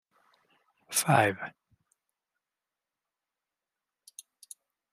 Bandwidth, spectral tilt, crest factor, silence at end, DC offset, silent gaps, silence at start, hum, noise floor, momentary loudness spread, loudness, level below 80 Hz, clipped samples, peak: 15 kHz; -4 dB/octave; 28 dB; 3.45 s; under 0.1%; none; 0.9 s; none; -90 dBFS; 26 LU; -27 LUFS; -76 dBFS; under 0.1%; -6 dBFS